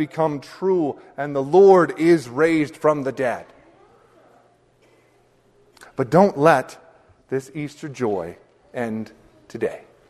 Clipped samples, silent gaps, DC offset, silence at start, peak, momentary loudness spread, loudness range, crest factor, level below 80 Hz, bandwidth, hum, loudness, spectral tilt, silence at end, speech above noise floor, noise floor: under 0.1%; none; under 0.1%; 0 s; 0 dBFS; 18 LU; 11 LU; 20 dB; -62 dBFS; 12.5 kHz; none; -20 LUFS; -7 dB/octave; 0.3 s; 39 dB; -58 dBFS